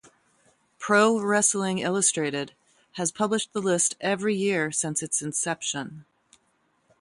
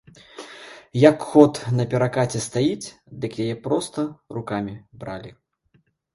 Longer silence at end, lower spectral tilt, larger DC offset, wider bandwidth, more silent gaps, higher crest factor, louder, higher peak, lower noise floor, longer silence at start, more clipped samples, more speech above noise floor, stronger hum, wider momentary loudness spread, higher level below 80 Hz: first, 1 s vs 0.85 s; second, -3 dB/octave vs -6.5 dB/octave; neither; about the same, 11.5 kHz vs 11.5 kHz; neither; about the same, 20 dB vs 22 dB; second, -24 LUFS vs -21 LUFS; second, -8 dBFS vs 0 dBFS; first, -69 dBFS vs -64 dBFS; first, 0.8 s vs 0.35 s; neither; about the same, 44 dB vs 42 dB; neither; second, 12 LU vs 21 LU; second, -70 dBFS vs -58 dBFS